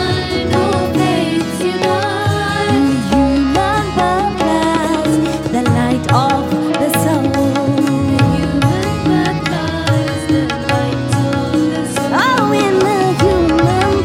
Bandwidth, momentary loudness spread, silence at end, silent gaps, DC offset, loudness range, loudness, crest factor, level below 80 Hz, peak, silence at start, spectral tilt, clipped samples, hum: 16.5 kHz; 4 LU; 0 s; none; under 0.1%; 1 LU; -14 LUFS; 14 dB; -32 dBFS; 0 dBFS; 0 s; -6 dB/octave; under 0.1%; none